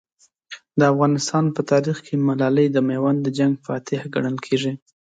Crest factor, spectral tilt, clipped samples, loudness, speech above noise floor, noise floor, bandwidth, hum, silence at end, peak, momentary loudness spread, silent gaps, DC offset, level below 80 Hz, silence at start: 16 dB; -6.5 dB/octave; under 0.1%; -21 LUFS; 24 dB; -43 dBFS; 9.2 kHz; none; 0.35 s; -6 dBFS; 9 LU; none; under 0.1%; -66 dBFS; 0.5 s